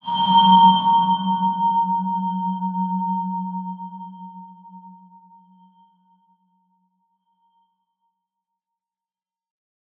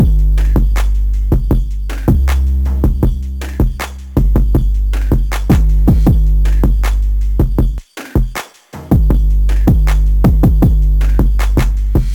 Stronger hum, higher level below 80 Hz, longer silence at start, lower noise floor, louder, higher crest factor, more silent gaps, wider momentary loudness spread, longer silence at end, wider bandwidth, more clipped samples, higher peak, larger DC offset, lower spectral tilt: neither; second, -76 dBFS vs -12 dBFS; about the same, 0.05 s vs 0 s; first, under -90 dBFS vs -32 dBFS; second, -18 LUFS vs -14 LUFS; first, 20 dB vs 10 dB; neither; first, 23 LU vs 7 LU; first, 5.05 s vs 0 s; second, 4.1 kHz vs 16.5 kHz; neither; about the same, -2 dBFS vs 0 dBFS; neither; about the same, -8.5 dB/octave vs -7.5 dB/octave